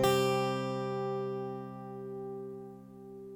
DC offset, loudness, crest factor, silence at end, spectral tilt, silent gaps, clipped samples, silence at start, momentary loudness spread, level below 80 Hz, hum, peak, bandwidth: under 0.1%; -35 LUFS; 20 dB; 0 s; -5.5 dB/octave; none; under 0.1%; 0 s; 19 LU; -66 dBFS; none; -14 dBFS; over 20 kHz